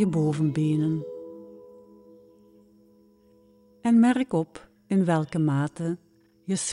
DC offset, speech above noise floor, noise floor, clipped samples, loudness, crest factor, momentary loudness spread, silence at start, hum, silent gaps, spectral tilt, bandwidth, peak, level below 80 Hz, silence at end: under 0.1%; 35 dB; -58 dBFS; under 0.1%; -25 LUFS; 16 dB; 21 LU; 0 s; none; none; -6.5 dB/octave; 11.5 kHz; -10 dBFS; -66 dBFS; 0 s